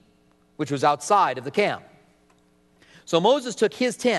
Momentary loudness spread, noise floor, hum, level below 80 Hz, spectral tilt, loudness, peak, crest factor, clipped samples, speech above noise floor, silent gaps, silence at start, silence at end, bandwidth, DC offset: 8 LU; -60 dBFS; none; -70 dBFS; -4 dB/octave; -23 LUFS; -6 dBFS; 18 dB; under 0.1%; 39 dB; none; 0.6 s; 0 s; 12 kHz; under 0.1%